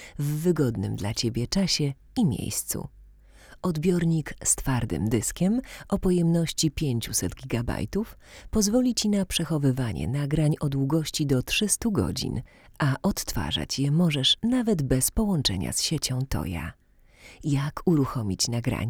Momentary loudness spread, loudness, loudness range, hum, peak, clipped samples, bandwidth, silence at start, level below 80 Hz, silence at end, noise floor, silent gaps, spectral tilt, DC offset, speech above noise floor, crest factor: 7 LU; -26 LUFS; 3 LU; none; -8 dBFS; under 0.1%; over 20 kHz; 0 s; -42 dBFS; 0 s; -51 dBFS; none; -4.5 dB/octave; under 0.1%; 26 dB; 18 dB